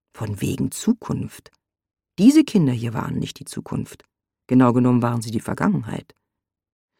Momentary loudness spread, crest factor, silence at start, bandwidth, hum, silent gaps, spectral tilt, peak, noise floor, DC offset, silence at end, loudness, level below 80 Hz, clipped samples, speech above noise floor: 17 LU; 18 dB; 0.15 s; 16 kHz; none; none; -6.5 dB/octave; -2 dBFS; -83 dBFS; under 0.1%; 1 s; -21 LUFS; -54 dBFS; under 0.1%; 63 dB